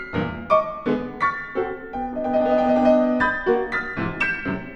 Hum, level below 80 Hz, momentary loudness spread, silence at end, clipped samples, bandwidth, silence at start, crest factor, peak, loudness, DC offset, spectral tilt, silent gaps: none; -46 dBFS; 10 LU; 0 s; under 0.1%; 7.4 kHz; 0 s; 18 dB; -4 dBFS; -22 LUFS; under 0.1%; -7.5 dB/octave; none